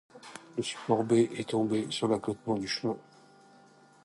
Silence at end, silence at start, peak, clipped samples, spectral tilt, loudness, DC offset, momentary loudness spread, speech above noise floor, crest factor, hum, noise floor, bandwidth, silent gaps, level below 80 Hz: 1.05 s; 0.15 s; -14 dBFS; under 0.1%; -5.5 dB/octave; -30 LUFS; under 0.1%; 13 LU; 29 dB; 18 dB; none; -59 dBFS; 11.5 kHz; none; -70 dBFS